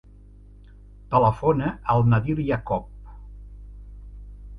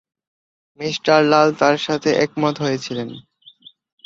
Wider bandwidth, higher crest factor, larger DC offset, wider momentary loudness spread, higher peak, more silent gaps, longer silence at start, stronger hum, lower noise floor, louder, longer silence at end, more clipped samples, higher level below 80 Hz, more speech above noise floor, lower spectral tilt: second, 5.2 kHz vs 7.8 kHz; about the same, 18 dB vs 18 dB; neither; first, 25 LU vs 14 LU; second, -6 dBFS vs -2 dBFS; neither; first, 1.1 s vs 0.8 s; first, 50 Hz at -40 dBFS vs none; about the same, -47 dBFS vs -48 dBFS; second, -23 LUFS vs -18 LUFS; second, 0 s vs 0.85 s; neither; first, -42 dBFS vs -62 dBFS; second, 26 dB vs 30 dB; first, -10 dB/octave vs -5 dB/octave